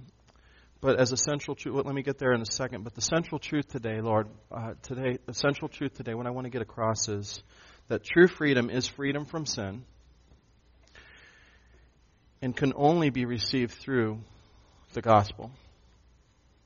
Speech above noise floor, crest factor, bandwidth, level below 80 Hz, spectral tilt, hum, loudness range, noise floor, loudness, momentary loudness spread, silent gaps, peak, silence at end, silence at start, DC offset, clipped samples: 34 dB; 24 dB; 7.2 kHz; -58 dBFS; -4.5 dB/octave; none; 6 LU; -63 dBFS; -29 LUFS; 14 LU; none; -8 dBFS; 1.1 s; 0 s; under 0.1%; under 0.1%